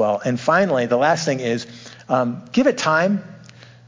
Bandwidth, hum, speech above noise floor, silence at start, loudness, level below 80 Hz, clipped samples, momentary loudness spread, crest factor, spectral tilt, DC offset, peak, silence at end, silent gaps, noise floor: 7.6 kHz; none; 25 dB; 0 s; -19 LUFS; -64 dBFS; under 0.1%; 9 LU; 16 dB; -5 dB/octave; under 0.1%; -4 dBFS; 0.5 s; none; -44 dBFS